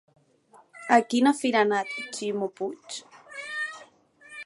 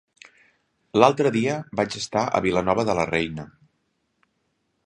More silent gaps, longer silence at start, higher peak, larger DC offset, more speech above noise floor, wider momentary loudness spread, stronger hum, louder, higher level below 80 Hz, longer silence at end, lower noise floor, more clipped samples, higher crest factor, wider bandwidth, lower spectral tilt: neither; second, 0.75 s vs 0.95 s; second, -6 dBFS vs 0 dBFS; neither; second, 33 dB vs 51 dB; first, 19 LU vs 9 LU; neither; second, -26 LUFS vs -22 LUFS; second, -80 dBFS vs -54 dBFS; second, 0 s vs 1.4 s; second, -58 dBFS vs -72 dBFS; neither; about the same, 22 dB vs 24 dB; about the same, 11.5 kHz vs 10.5 kHz; second, -3.5 dB/octave vs -5.5 dB/octave